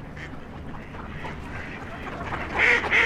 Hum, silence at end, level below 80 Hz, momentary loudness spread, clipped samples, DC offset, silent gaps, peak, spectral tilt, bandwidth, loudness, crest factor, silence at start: none; 0 s; -44 dBFS; 19 LU; under 0.1%; under 0.1%; none; -6 dBFS; -4.5 dB/octave; 15 kHz; -25 LUFS; 20 dB; 0 s